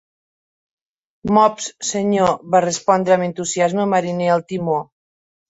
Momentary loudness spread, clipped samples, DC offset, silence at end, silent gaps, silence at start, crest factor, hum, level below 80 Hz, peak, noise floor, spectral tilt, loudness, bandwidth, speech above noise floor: 7 LU; under 0.1%; under 0.1%; 0.65 s; none; 1.25 s; 18 dB; none; -56 dBFS; -2 dBFS; under -90 dBFS; -4.5 dB/octave; -18 LUFS; 8.2 kHz; over 73 dB